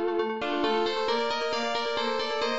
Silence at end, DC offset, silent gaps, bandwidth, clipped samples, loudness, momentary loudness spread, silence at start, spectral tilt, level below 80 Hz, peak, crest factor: 0 s; 0.7%; none; 8 kHz; under 0.1%; -28 LUFS; 2 LU; 0 s; -0.5 dB/octave; -62 dBFS; -16 dBFS; 12 dB